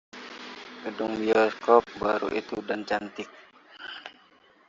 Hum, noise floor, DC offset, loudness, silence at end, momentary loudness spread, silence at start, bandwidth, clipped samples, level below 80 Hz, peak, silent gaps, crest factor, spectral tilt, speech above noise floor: none; -59 dBFS; under 0.1%; -26 LUFS; 0.6 s; 20 LU; 0.15 s; 7.6 kHz; under 0.1%; -64 dBFS; -4 dBFS; none; 24 dB; -5 dB/octave; 33 dB